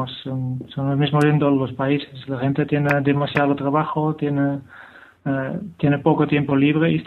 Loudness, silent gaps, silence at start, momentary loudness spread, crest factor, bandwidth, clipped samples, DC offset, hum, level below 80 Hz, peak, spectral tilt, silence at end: -20 LUFS; none; 0 s; 10 LU; 18 dB; 10 kHz; under 0.1%; under 0.1%; none; -56 dBFS; -2 dBFS; -8.5 dB/octave; 0 s